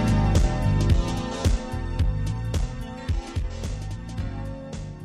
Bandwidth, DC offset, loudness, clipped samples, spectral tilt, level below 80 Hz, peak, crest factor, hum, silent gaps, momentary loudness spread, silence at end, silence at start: 13 kHz; under 0.1%; -27 LUFS; under 0.1%; -6.5 dB/octave; -28 dBFS; -8 dBFS; 16 dB; none; none; 12 LU; 0 s; 0 s